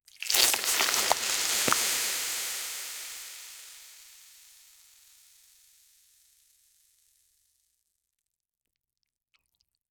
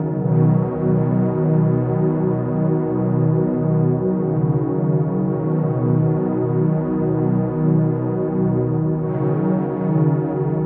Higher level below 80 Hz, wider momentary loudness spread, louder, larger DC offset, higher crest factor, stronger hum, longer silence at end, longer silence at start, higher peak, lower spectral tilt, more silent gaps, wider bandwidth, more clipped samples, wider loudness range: second, -70 dBFS vs -48 dBFS; first, 23 LU vs 3 LU; second, -26 LUFS vs -19 LUFS; neither; first, 30 dB vs 14 dB; neither; first, 5.75 s vs 0 s; first, 0.2 s vs 0 s; about the same, -4 dBFS vs -4 dBFS; second, 1 dB/octave vs -13 dB/octave; neither; first, over 20 kHz vs 2.7 kHz; neither; first, 24 LU vs 1 LU